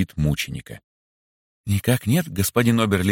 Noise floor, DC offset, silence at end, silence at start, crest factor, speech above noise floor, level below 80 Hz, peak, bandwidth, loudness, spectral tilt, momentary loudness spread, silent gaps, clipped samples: under -90 dBFS; under 0.1%; 0 s; 0 s; 18 dB; over 69 dB; -42 dBFS; -4 dBFS; 17 kHz; -21 LUFS; -5.5 dB/octave; 16 LU; 0.84-1.64 s; under 0.1%